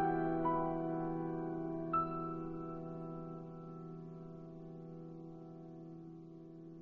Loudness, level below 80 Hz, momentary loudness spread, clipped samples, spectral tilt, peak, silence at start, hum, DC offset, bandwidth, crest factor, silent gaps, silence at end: -42 LUFS; -64 dBFS; 17 LU; under 0.1%; -9 dB/octave; -24 dBFS; 0 s; none; under 0.1%; 4.3 kHz; 16 dB; none; 0 s